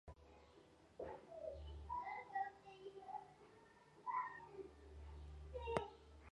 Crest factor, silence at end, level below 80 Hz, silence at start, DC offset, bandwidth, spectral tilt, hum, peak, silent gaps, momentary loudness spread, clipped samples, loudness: 30 dB; 0 s; -62 dBFS; 0.05 s; under 0.1%; 11 kHz; -6 dB/octave; none; -22 dBFS; none; 20 LU; under 0.1%; -51 LUFS